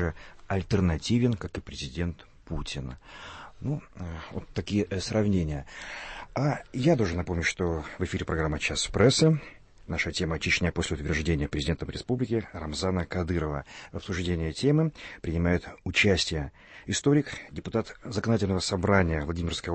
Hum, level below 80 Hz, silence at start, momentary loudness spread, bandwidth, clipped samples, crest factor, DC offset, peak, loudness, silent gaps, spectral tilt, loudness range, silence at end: none; -42 dBFS; 0 s; 14 LU; 8.8 kHz; under 0.1%; 20 dB; under 0.1%; -10 dBFS; -28 LUFS; none; -5.5 dB/octave; 5 LU; 0 s